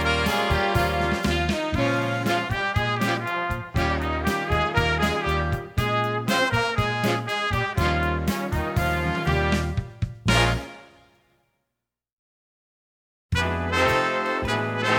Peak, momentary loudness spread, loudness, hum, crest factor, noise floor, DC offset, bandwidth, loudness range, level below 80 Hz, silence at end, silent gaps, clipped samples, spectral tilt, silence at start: -6 dBFS; 5 LU; -24 LUFS; none; 18 dB; -83 dBFS; under 0.1%; 19.5 kHz; 5 LU; -36 dBFS; 0 s; 12.13-13.29 s; under 0.1%; -5 dB/octave; 0 s